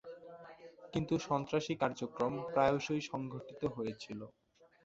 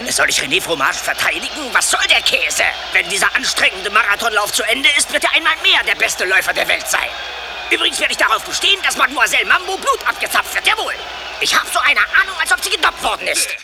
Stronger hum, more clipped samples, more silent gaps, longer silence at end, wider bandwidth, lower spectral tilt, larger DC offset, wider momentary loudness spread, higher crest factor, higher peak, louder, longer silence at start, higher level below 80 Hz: neither; neither; neither; first, 0.55 s vs 0 s; second, 8 kHz vs over 20 kHz; first, -5 dB/octave vs 0.5 dB/octave; neither; first, 21 LU vs 6 LU; first, 22 dB vs 16 dB; second, -16 dBFS vs 0 dBFS; second, -37 LUFS vs -14 LUFS; about the same, 0.05 s vs 0 s; second, -66 dBFS vs -46 dBFS